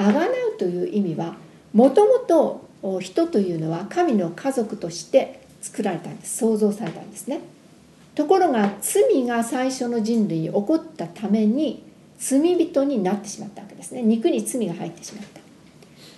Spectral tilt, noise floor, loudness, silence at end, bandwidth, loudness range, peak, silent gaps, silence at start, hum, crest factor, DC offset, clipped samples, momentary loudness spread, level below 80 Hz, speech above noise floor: -5.5 dB/octave; -50 dBFS; -22 LUFS; 0.05 s; 12.5 kHz; 5 LU; -4 dBFS; none; 0 s; none; 18 dB; under 0.1%; under 0.1%; 15 LU; -66 dBFS; 28 dB